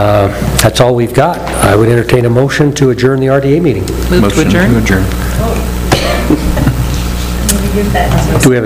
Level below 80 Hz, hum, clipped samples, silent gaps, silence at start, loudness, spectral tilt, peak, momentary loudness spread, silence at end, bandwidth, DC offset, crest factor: -18 dBFS; none; 0.7%; none; 0 s; -10 LUFS; -5.5 dB/octave; 0 dBFS; 6 LU; 0 s; 16.5 kHz; under 0.1%; 10 dB